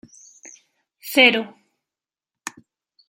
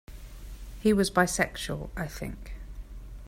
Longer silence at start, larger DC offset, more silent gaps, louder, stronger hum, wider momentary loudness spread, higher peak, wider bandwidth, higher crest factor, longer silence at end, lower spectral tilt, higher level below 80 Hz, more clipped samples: first, 0.45 s vs 0.1 s; neither; neither; first, -16 LUFS vs -28 LUFS; neither; about the same, 23 LU vs 22 LU; first, -2 dBFS vs -8 dBFS; about the same, 16 kHz vs 16 kHz; about the same, 24 dB vs 22 dB; first, 0.6 s vs 0 s; second, -2 dB/octave vs -4.5 dB/octave; second, -74 dBFS vs -42 dBFS; neither